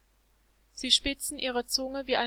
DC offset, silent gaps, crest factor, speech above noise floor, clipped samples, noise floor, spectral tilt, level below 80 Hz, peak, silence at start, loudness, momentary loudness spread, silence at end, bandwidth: under 0.1%; none; 22 dB; 37 dB; under 0.1%; -67 dBFS; -1 dB/octave; -52 dBFS; -8 dBFS; 0.75 s; -28 LUFS; 11 LU; 0 s; 17 kHz